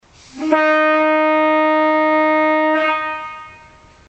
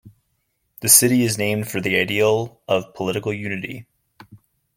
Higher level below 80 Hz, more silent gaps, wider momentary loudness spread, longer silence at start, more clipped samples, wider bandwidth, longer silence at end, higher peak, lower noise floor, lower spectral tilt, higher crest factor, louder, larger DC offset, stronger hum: about the same, -58 dBFS vs -60 dBFS; neither; second, 12 LU vs 15 LU; first, 0.35 s vs 0.05 s; neither; second, 8 kHz vs 17 kHz; first, 0.55 s vs 0.4 s; about the same, -2 dBFS vs 0 dBFS; second, -45 dBFS vs -71 dBFS; first, -4.5 dB/octave vs -3 dB/octave; second, 14 dB vs 22 dB; first, -15 LUFS vs -18 LUFS; neither; neither